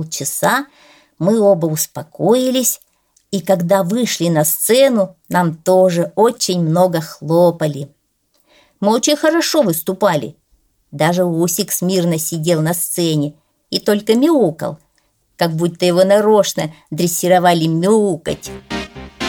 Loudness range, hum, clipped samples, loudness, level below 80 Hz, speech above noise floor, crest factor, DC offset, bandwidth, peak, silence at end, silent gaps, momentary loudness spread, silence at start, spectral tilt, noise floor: 3 LU; none; under 0.1%; -15 LUFS; -54 dBFS; 47 dB; 14 dB; under 0.1%; 19 kHz; -2 dBFS; 0 s; none; 12 LU; 0 s; -4.5 dB/octave; -62 dBFS